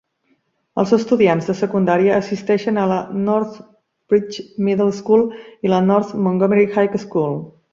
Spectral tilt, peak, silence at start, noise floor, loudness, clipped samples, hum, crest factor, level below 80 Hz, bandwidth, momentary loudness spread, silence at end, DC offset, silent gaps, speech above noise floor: -7.5 dB/octave; -2 dBFS; 0.75 s; -64 dBFS; -18 LUFS; under 0.1%; none; 16 dB; -58 dBFS; 7.6 kHz; 8 LU; 0.2 s; under 0.1%; none; 47 dB